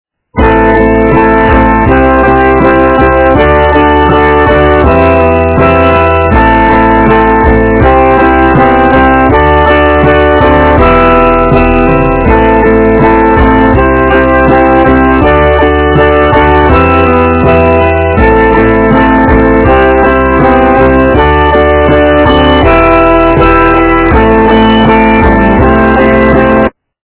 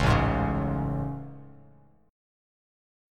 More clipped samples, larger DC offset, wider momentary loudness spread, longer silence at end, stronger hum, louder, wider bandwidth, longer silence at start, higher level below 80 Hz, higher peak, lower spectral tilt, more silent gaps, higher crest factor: first, 7% vs under 0.1%; first, 0.3% vs under 0.1%; second, 1 LU vs 20 LU; second, 0.35 s vs 1 s; neither; first, -5 LUFS vs -28 LUFS; second, 4 kHz vs 12 kHz; first, 0.35 s vs 0 s; first, -14 dBFS vs -38 dBFS; first, 0 dBFS vs -8 dBFS; first, -10.5 dB/octave vs -7 dB/octave; neither; second, 4 dB vs 22 dB